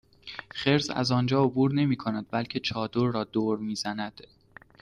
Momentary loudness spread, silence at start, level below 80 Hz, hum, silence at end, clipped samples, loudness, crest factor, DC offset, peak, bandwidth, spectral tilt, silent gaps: 11 LU; 0.25 s; -60 dBFS; none; 0.6 s; under 0.1%; -27 LUFS; 18 dB; under 0.1%; -10 dBFS; 11 kHz; -6 dB/octave; none